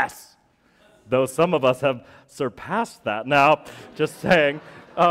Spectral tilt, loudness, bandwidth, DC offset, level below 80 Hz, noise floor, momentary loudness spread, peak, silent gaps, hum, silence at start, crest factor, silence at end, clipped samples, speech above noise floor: -5 dB/octave; -22 LUFS; 16 kHz; under 0.1%; -56 dBFS; -60 dBFS; 12 LU; -6 dBFS; none; none; 0 s; 18 dB; 0 s; under 0.1%; 38 dB